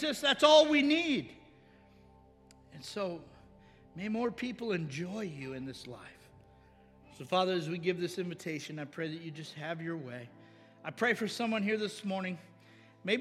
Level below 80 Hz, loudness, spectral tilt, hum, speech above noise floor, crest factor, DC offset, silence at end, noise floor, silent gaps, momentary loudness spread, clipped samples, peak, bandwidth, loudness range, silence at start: -70 dBFS; -32 LUFS; -4.5 dB/octave; none; 28 dB; 24 dB; under 0.1%; 0 s; -60 dBFS; none; 20 LU; under 0.1%; -10 dBFS; 14 kHz; 9 LU; 0 s